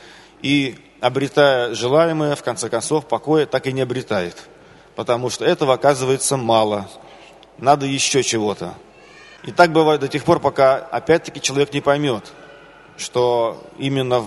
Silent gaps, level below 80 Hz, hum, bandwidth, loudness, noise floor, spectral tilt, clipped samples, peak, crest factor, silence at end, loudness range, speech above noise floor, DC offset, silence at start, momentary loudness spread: none; -56 dBFS; none; 11.5 kHz; -18 LUFS; -44 dBFS; -4.5 dB/octave; under 0.1%; 0 dBFS; 18 dB; 0 s; 3 LU; 26 dB; under 0.1%; 0.05 s; 11 LU